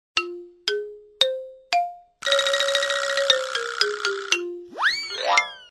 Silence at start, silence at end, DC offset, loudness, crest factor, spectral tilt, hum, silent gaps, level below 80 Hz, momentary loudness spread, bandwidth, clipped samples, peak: 0.15 s; 0.05 s; under 0.1%; -23 LUFS; 24 dB; 1 dB/octave; none; none; -70 dBFS; 11 LU; 13 kHz; under 0.1%; 0 dBFS